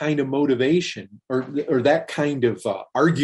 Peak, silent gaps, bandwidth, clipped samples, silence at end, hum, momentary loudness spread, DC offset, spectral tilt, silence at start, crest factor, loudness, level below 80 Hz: -6 dBFS; none; 11.5 kHz; under 0.1%; 0 s; none; 8 LU; under 0.1%; -6.5 dB/octave; 0 s; 16 dB; -22 LUFS; -64 dBFS